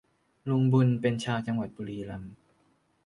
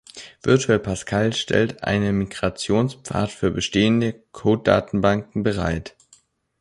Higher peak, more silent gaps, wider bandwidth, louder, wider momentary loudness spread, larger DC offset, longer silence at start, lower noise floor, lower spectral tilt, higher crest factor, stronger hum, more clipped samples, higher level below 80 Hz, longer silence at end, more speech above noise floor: second, -12 dBFS vs -2 dBFS; neither; about the same, 11 kHz vs 11.5 kHz; second, -28 LUFS vs -21 LUFS; first, 17 LU vs 7 LU; neither; first, 0.45 s vs 0.15 s; first, -69 dBFS vs -57 dBFS; first, -7.5 dB/octave vs -5.5 dB/octave; about the same, 18 dB vs 20 dB; neither; neither; second, -62 dBFS vs -44 dBFS; about the same, 0.7 s vs 0.7 s; first, 41 dB vs 37 dB